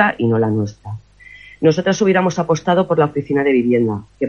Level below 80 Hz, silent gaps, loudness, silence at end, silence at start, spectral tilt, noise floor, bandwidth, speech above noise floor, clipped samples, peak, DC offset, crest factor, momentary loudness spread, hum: -52 dBFS; none; -16 LUFS; 0 s; 0 s; -6.5 dB/octave; -42 dBFS; 7.2 kHz; 26 dB; under 0.1%; 0 dBFS; under 0.1%; 16 dB; 9 LU; none